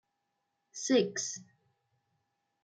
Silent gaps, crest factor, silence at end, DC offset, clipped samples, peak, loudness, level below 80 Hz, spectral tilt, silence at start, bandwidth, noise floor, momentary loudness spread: none; 22 dB; 1.2 s; under 0.1%; under 0.1%; -16 dBFS; -32 LUFS; -84 dBFS; -3 dB/octave; 0.75 s; 10 kHz; -83 dBFS; 17 LU